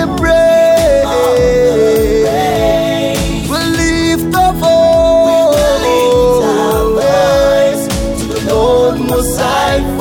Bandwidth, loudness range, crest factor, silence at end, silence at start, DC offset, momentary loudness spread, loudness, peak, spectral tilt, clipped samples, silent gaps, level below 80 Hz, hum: over 20 kHz; 2 LU; 10 dB; 0 s; 0 s; under 0.1%; 6 LU; -11 LUFS; -2 dBFS; -5 dB/octave; under 0.1%; none; -24 dBFS; none